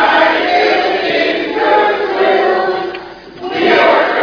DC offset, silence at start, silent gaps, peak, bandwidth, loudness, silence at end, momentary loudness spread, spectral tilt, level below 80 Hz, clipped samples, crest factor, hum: under 0.1%; 0 s; none; 0 dBFS; 5.4 kHz; -12 LUFS; 0 s; 12 LU; -4.5 dB/octave; -50 dBFS; under 0.1%; 12 dB; none